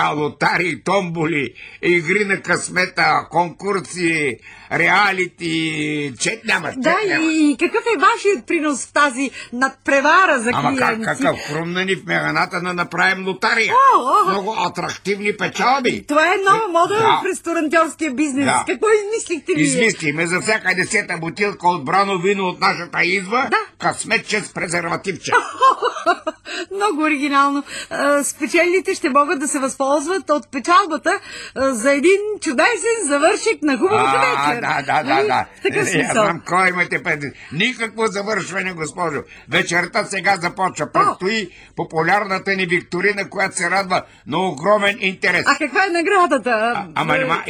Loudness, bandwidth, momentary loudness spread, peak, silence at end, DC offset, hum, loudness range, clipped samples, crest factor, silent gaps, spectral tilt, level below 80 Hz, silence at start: -17 LUFS; 16 kHz; 7 LU; -2 dBFS; 0 s; under 0.1%; none; 3 LU; under 0.1%; 16 dB; none; -3.5 dB/octave; -56 dBFS; 0 s